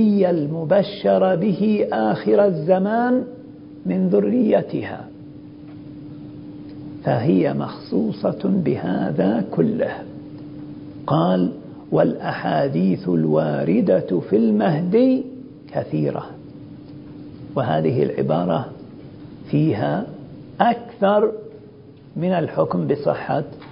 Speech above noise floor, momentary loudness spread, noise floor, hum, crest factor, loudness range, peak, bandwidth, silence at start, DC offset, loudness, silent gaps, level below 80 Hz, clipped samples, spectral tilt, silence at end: 24 dB; 21 LU; -43 dBFS; none; 20 dB; 5 LU; 0 dBFS; 5.4 kHz; 0 s; under 0.1%; -20 LUFS; none; -56 dBFS; under 0.1%; -12.5 dB/octave; 0 s